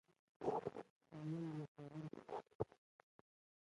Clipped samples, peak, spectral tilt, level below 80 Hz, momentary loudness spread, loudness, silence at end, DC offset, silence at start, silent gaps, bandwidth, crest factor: under 0.1%; -26 dBFS; -8.5 dB/octave; -76 dBFS; 9 LU; -49 LUFS; 1.05 s; under 0.1%; 0.4 s; 0.90-1.01 s, 1.68-1.75 s, 2.55-2.59 s; 11 kHz; 24 dB